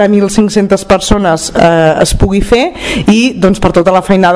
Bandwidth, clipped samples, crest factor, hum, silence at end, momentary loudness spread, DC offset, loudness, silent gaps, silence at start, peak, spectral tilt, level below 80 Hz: 11 kHz; 5%; 8 dB; none; 0 s; 3 LU; under 0.1%; -9 LUFS; none; 0 s; 0 dBFS; -5.5 dB/octave; -22 dBFS